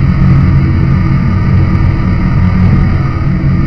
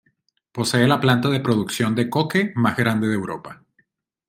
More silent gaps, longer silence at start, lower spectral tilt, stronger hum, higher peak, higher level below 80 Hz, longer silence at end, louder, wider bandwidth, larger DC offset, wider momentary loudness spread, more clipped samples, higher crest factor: neither; second, 0 s vs 0.55 s; first, -9.5 dB/octave vs -5.5 dB/octave; neither; first, 0 dBFS vs -4 dBFS; first, -16 dBFS vs -60 dBFS; second, 0 s vs 0.75 s; first, -10 LUFS vs -20 LUFS; second, 6 kHz vs 16.5 kHz; first, 5% vs under 0.1%; second, 4 LU vs 13 LU; first, 0.7% vs under 0.1%; second, 8 dB vs 18 dB